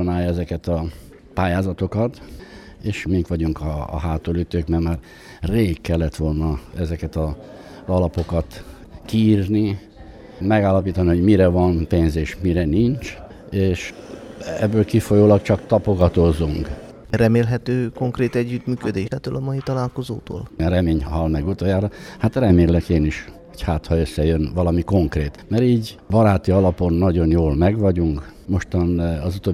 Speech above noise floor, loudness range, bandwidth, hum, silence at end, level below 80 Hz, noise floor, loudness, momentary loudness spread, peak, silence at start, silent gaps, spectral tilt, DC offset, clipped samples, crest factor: 21 dB; 6 LU; 13.5 kHz; none; 0 s; -32 dBFS; -40 dBFS; -20 LUFS; 13 LU; -2 dBFS; 0 s; none; -8 dB/octave; under 0.1%; under 0.1%; 18 dB